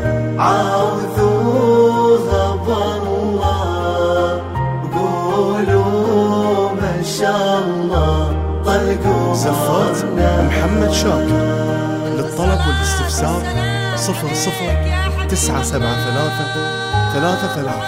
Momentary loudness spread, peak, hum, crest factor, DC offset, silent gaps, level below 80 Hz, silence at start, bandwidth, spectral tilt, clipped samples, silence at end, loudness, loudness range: 5 LU; -2 dBFS; none; 14 dB; under 0.1%; none; -26 dBFS; 0 s; 16 kHz; -5.5 dB/octave; under 0.1%; 0 s; -16 LUFS; 3 LU